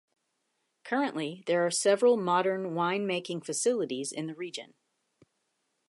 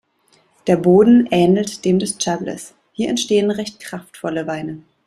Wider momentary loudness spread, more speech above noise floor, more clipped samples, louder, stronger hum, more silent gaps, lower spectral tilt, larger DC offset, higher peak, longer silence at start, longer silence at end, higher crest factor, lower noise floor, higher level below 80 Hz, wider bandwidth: second, 12 LU vs 18 LU; first, 50 dB vs 42 dB; neither; second, -29 LUFS vs -17 LUFS; neither; neither; second, -3.5 dB/octave vs -5.5 dB/octave; neither; second, -12 dBFS vs -2 dBFS; first, 0.85 s vs 0.65 s; first, 1.25 s vs 0.25 s; about the same, 18 dB vs 16 dB; first, -79 dBFS vs -58 dBFS; second, -86 dBFS vs -56 dBFS; second, 11.5 kHz vs 13.5 kHz